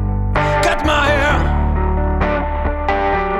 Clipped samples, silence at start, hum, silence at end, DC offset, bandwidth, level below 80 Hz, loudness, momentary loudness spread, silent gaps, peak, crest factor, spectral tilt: under 0.1%; 0 s; none; 0 s; under 0.1%; 11.5 kHz; -20 dBFS; -16 LUFS; 5 LU; none; -2 dBFS; 12 dB; -6 dB/octave